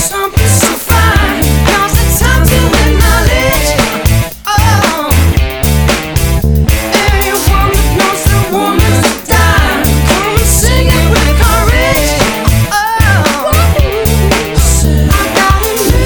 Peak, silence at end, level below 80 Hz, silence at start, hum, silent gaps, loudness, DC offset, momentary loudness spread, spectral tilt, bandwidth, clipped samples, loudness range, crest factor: 0 dBFS; 0 s; -12 dBFS; 0 s; none; none; -9 LUFS; under 0.1%; 3 LU; -4.5 dB/octave; over 20 kHz; 0.2%; 2 LU; 8 dB